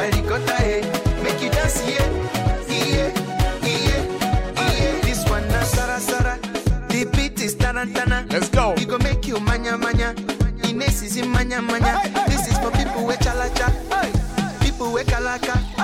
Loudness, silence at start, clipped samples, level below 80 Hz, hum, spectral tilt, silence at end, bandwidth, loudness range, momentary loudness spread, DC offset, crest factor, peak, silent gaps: -21 LUFS; 0 s; under 0.1%; -26 dBFS; none; -4.5 dB/octave; 0 s; 16.5 kHz; 1 LU; 3 LU; under 0.1%; 16 dB; -4 dBFS; none